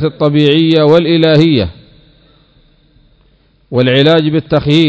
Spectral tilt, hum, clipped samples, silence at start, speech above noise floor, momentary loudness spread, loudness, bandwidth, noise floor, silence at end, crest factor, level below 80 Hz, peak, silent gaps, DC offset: -8 dB/octave; none; 0.6%; 0 s; 41 dB; 6 LU; -10 LUFS; 8 kHz; -50 dBFS; 0 s; 12 dB; -38 dBFS; 0 dBFS; none; under 0.1%